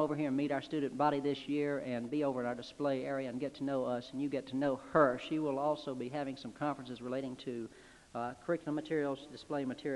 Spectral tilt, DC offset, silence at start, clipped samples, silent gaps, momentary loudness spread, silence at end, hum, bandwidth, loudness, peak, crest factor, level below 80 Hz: -6.5 dB/octave; under 0.1%; 0 s; under 0.1%; none; 9 LU; 0 s; none; 11.5 kHz; -36 LUFS; -14 dBFS; 22 dB; -70 dBFS